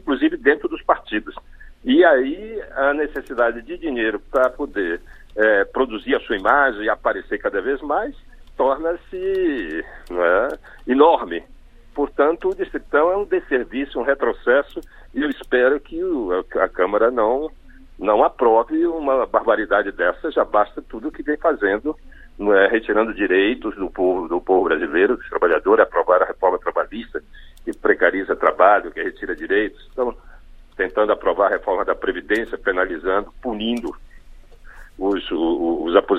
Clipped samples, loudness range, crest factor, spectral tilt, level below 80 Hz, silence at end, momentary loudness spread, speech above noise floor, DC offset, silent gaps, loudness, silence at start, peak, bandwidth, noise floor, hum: under 0.1%; 4 LU; 20 dB; -6 dB/octave; -44 dBFS; 0 s; 12 LU; 23 dB; under 0.1%; none; -20 LUFS; 0.05 s; 0 dBFS; 9.6 kHz; -42 dBFS; none